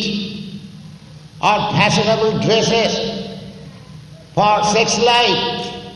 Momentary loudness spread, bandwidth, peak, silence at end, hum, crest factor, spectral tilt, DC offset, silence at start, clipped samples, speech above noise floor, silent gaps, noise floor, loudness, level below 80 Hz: 21 LU; 12 kHz; -2 dBFS; 0 s; none; 16 dB; -4 dB/octave; under 0.1%; 0 s; under 0.1%; 23 dB; none; -38 dBFS; -15 LUFS; -46 dBFS